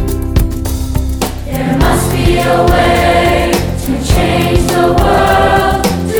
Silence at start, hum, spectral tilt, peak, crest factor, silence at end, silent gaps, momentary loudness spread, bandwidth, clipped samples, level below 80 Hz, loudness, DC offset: 0 s; none; -5.5 dB/octave; 0 dBFS; 10 dB; 0 s; none; 8 LU; over 20 kHz; under 0.1%; -18 dBFS; -11 LUFS; under 0.1%